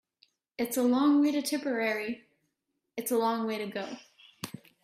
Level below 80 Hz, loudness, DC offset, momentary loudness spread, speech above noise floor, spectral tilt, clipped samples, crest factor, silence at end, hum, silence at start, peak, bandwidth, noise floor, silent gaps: -76 dBFS; -29 LUFS; under 0.1%; 19 LU; 54 dB; -4 dB/octave; under 0.1%; 16 dB; 0.35 s; none; 0.6 s; -16 dBFS; 15.5 kHz; -82 dBFS; none